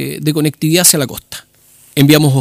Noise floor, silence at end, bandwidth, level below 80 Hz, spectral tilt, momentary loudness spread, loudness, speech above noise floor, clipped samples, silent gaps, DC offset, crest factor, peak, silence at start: -47 dBFS; 0 s; over 20 kHz; -50 dBFS; -4 dB/octave; 19 LU; -11 LUFS; 35 dB; 0.2%; none; under 0.1%; 14 dB; 0 dBFS; 0 s